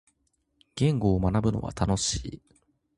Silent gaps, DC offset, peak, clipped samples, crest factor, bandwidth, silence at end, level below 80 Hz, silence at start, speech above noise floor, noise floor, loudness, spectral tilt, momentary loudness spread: none; under 0.1%; -8 dBFS; under 0.1%; 20 dB; 11.5 kHz; 0.6 s; -42 dBFS; 0.75 s; 48 dB; -73 dBFS; -27 LUFS; -5.5 dB/octave; 11 LU